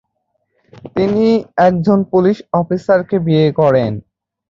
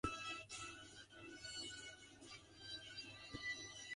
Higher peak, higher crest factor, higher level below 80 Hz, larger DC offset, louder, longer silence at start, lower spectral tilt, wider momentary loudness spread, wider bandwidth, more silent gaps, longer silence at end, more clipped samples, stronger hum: first, -2 dBFS vs -26 dBFS; second, 14 dB vs 26 dB; first, -50 dBFS vs -68 dBFS; neither; first, -14 LUFS vs -51 LUFS; first, 0.85 s vs 0.05 s; first, -9 dB/octave vs -2 dB/octave; second, 6 LU vs 11 LU; second, 7.4 kHz vs 11.5 kHz; neither; first, 0.5 s vs 0 s; neither; neither